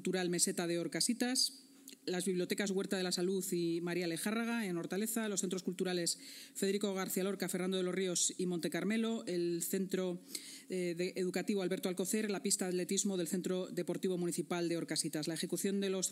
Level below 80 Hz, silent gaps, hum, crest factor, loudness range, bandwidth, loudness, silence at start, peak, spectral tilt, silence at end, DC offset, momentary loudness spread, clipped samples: under -90 dBFS; none; none; 20 dB; 2 LU; 16 kHz; -36 LUFS; 0 s; -16 dBFS; -3.5 dB/octave; 0 s; under 0.1%; 6 LU; under 0.1%